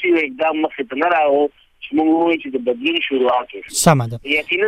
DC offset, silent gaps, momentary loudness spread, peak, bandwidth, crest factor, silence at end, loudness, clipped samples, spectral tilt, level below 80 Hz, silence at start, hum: under 0.1%; none; 7 LU; 0 dBFS; 16 kHz; 18 dB; 0 s; -18 LUFS; under 0.1%; -4.5 dB/octave; -52 dBFS; 0 s; none